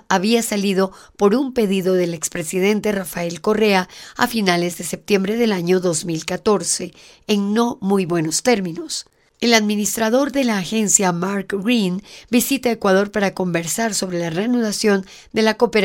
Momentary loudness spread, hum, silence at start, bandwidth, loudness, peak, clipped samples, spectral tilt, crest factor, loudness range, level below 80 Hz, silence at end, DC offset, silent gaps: 7 LU; none; 0.1 s; 17 kHz; -19 LUFS; 0 dBFS; under 0.1%; -4 dB/octave; 18 dB; 2 LU; -54 dBFS; 0 s; under 0.1%; none